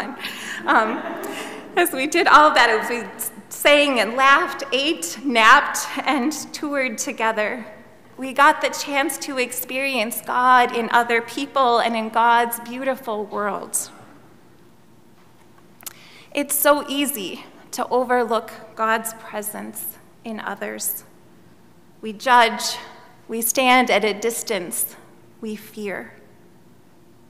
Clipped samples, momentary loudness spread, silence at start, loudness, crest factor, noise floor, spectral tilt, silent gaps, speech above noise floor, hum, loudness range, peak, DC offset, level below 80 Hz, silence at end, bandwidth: under 0.1%; 17 LU; 0 s; -19 LUFS; 20 dB; -52 dBFS; -1.5 dB/octave; none; 32 dB; none; 10 LU; 0 dBFS; 0.3%; -62 dBFS; 1.2 s; 16 kHz